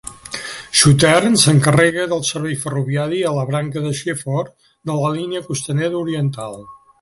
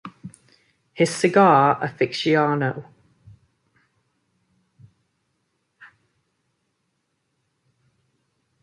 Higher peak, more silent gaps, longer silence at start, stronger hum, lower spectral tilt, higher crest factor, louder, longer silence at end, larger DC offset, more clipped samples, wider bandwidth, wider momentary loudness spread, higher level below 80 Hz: first, 0 dBFS vs -4 dBFS; neither; about the same, 0.05 s vs 0.05 s; neither; about the same, -4.5 dB/octave vs -5.5 dB/octave; about the same, 18 dB vs 22 dB; about the same, -17 LUFS vs -19 LUFS; second, 0.25 s vs 2.75 s; neither; neither; about the same, 12 kHz vs 11.5 kHz; second, 16 LU vs 20 LU; first, -48 dBFS vs -68 dBFS